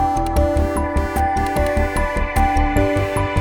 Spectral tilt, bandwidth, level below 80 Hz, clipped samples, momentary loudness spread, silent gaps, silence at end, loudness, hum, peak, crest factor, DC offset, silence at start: -6.5 dB/octave; 19 kHz; -22 dBFS; under 0.1%; 3 LU; none; 0 s; -19 LUFS; none; -4 dBFS; 14 dB; under 0.1%; 0 s